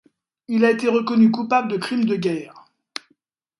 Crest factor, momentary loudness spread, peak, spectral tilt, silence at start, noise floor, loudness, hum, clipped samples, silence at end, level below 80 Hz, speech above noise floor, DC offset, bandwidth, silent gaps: 18 dB; 19 LU; -4 dBFS; -6.5 dB/octave; 0.5 s; -66 dBFS; -20 LUFS; none; under 0.1%; 1 s; -70 dBFS; 47 dB; under 0.1%; 11.5 kHz; none